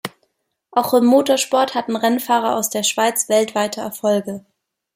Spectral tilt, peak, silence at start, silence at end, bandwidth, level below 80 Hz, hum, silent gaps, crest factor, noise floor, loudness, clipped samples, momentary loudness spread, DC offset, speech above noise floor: -3 dB/octave; -2 dBFS; 0.05 s; 0.55 s; 16.5 kHz; -68 dBFS; none; none; 16 dB; -68 dBFS; -18 LUFS; under 0.1%; 9 LU; under 0.1%; 51 dB